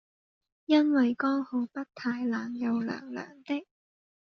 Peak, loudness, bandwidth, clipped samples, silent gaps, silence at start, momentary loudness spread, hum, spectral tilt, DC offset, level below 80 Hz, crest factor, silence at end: -12 dBFS; -29 LUFS; 6.6 kHz; under 0.1%; none; 0.7 s; 13 LU; none; -3.5 dB/octave; under 0.1%; -78 dBFS; 18 dB; 0.7 s